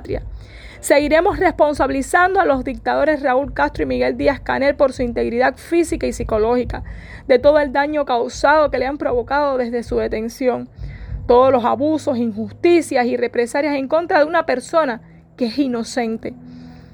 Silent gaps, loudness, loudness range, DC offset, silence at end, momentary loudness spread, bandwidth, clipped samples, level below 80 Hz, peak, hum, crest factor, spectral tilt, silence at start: none; -18 LUFS; 2 LU; under 0.1%; 0.15 s; 13 LU; 19.5 kHz; under 0.1%; -36 dBFS; -2 dBFS; none; 16 dB; -5 dB/octave; 0 s